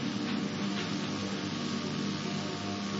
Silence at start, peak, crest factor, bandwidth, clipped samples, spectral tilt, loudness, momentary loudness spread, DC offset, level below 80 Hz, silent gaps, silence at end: 0 s; -22 dBFS; 12 dB; 7.6 kHz; under 0.1%; -4 dB/octave; -34 LUFS; 2 LU; under 0.1%; -68 dBFS; none; 0 s